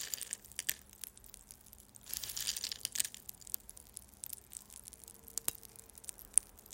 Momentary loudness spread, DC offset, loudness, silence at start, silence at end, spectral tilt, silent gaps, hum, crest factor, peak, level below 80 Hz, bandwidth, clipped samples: 20 LU; under 0.1%; -39 LUFS; 0 s; 0 s; 1 dB/octave; none; none; 36 dB; -8 dBFS; -66 dBFS; 16.5 kHz; under 0.1%